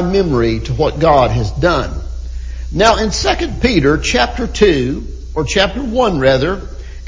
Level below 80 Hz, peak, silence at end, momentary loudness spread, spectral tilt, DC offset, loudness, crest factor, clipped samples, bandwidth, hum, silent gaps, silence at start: -24 dBFS; 0 dBFS; 0 s; 13 LU; -5 dB/octave; under 0.1%; -14 LUFS; 14 dB; under 0.1%; 7.6 kHz; none; none; 0 s